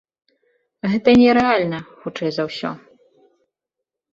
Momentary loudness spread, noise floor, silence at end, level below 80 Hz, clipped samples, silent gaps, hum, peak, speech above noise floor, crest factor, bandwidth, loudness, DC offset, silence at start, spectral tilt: 17 LU; -83 dBFS; 1.35 s; -52 dBFS; under 0.1%; none; none; -2 dBFS; 66 dB; 18 dB; 7.4 kHz; -18 LUFS; under 0.1%; 0.85 s; -6.5 dB/octave